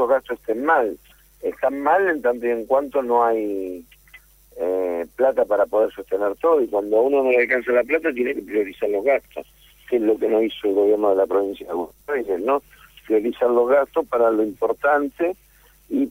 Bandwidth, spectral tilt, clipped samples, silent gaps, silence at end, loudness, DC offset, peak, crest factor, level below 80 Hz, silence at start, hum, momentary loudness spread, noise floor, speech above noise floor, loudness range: 16 kHz; -5.5 dB/octave; under 0.1%; none; 0 s; -21 LUFS; under 0.1%; -6 dBFS; 14 dB; -56 dBFS; 0 s; none; 9 LU; -50 dBFS; 30 dB; 3 LU